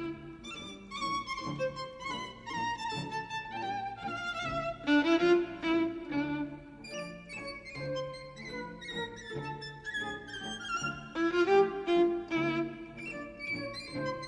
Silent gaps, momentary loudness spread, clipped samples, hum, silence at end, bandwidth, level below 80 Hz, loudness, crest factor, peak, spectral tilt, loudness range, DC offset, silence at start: none; 15 LU; under 0.1%; none; 0 s; 10.5 kHz; -60 dBFS; -34 LUFS; 18 dB; -14 dBFS; -5 dB/octave; 8 LU; under 0.1%; 0 s